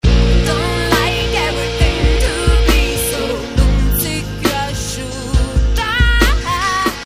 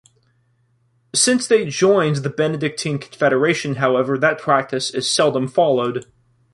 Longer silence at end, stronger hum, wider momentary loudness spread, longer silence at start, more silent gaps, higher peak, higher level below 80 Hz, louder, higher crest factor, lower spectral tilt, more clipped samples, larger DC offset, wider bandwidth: second, 0 s vs 0.5 s; neither; about the same, 6 LU vs 7 LU; second, 0.05 s vs 1.15 s; neither; about the same, 0 dBFS vs -2 dBFS; first, -16 dBFS vs -62 dBFS; first, -15 LUFS vs -18 LUFS; about the same, 14 dB vs 18 dB; about the same, -4.5 dB/octave vs -4 dB/octave; neither; neither; first, 15.5 kHz vs 11.5 kHz